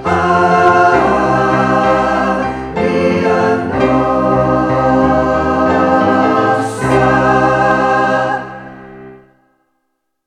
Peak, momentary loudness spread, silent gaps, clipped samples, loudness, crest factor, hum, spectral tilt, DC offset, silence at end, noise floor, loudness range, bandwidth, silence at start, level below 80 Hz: 0 dBFS; 6 LU; none; under 0.1%; -12 LUFS; 12 dB; none; -6.5 dB/octave; under 0.1%; 1.1 s; -68 dBFS; 2 LU; 11 kHz; 0 s; -36 dBFS